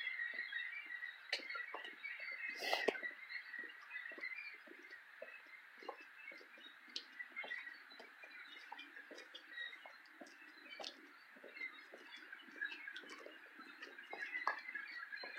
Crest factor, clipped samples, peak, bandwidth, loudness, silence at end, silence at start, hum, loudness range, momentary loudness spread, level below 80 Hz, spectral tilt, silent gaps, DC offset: 30 dB; under 0.1%; -20 dBFS; 16 kHz; -48 LUFS; 0 s; 0 s; none; 9 LU; 14 LU; under -90 dBFS; -0.5 dB/octave; none; under 0.1%